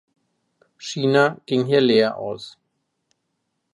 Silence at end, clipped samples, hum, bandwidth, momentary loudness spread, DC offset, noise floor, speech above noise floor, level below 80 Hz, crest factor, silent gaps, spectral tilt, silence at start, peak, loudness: 1.25 s; under 0.1%; none; 11.5 kHz; 18 LU; under 0.1%; -75 dBFS; 56 dB; -70 dBFS; 20 dB; none; -5.5 dB/octave; 0.8 s; -4 dBFS; -20 LUFS